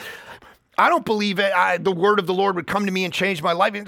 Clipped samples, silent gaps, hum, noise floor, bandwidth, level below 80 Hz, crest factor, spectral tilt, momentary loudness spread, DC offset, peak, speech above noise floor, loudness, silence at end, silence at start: under 0.1%; none; none; -45 dBFS; 17 kHz; -62 dBFS; 18 dB; -5 dB/octave; 5 LU; under 0.1%; -2 dBFS; 25 dB; -20 LUFS; 0 s; 0 s